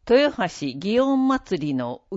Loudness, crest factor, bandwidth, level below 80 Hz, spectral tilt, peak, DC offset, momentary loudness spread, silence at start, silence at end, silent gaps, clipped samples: -22 LUFS; 16 dB; 8 kHz; -52 dBFS; -6 dB/octave; -4 dBFS; under 0.1%; 8 LU; 0.05 s; 0 s; none; under 0.1%